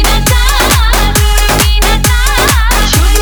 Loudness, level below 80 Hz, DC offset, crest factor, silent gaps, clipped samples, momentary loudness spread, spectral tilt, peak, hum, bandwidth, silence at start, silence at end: -9 LUFS; -10 dBFS; under 0.1%; 8 dB; none; 0.1%; 1 LU; -3 dB/octave; 0 dBFS; none; over 20 kHz; 0 s; 0 s